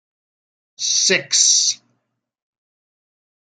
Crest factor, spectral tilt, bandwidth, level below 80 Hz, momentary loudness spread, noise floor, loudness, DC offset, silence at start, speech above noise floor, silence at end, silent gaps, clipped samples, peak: 22 dB; 1 dB/octave; 12 kHz; -78 dBFS; 11 LU; -74 dBFS; -14 LUFS; under 0.1%; 0.8 s; 57 dB; 1.8 s; none; under 0.1%; 0 dBFS